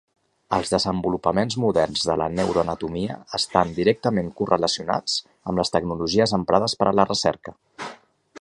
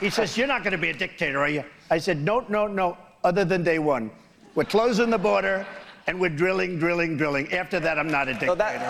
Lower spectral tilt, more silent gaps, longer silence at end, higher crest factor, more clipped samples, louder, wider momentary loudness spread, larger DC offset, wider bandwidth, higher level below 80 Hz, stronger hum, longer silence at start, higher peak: about the same, -4.5 dB/octave vs -5.5 dB/octave; neither; about the same, 0 s vs 0 s; first, 22 dB vs 14 dB; neither; about the same, -22 LUFS vs -24 LUFS; about the same, 8 LU vs 7 LU; neither; second, 11.5 kHz vs 15.5 kHz; first, -48 dBFS vs -54 dBFS; neither; first, 0.5 s vs 0 s; first, -2 dBFS vs -10 dBFS